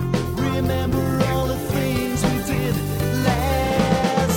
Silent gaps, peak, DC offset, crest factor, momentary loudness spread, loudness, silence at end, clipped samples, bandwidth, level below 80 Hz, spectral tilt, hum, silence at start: none; -6 dBFS; under 0.1%; 16 dB; 4 LU; -21 LUFS; 0 s; under 0.1%; 19 kHz; -32 dBFS; -6 dB/octave; none; 0 s